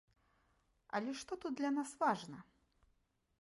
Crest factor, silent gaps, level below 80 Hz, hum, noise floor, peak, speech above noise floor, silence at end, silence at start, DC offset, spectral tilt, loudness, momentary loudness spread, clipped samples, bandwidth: 20 dB; none; -78 dBFS; none; -79 dBFS; -22 dBFS; 39 dB; 1 s; 0.95 s; under 0.1%; -4.5 dB/octave; -40 LUFS; 10 LU; under 0.1%; 11.5 kHz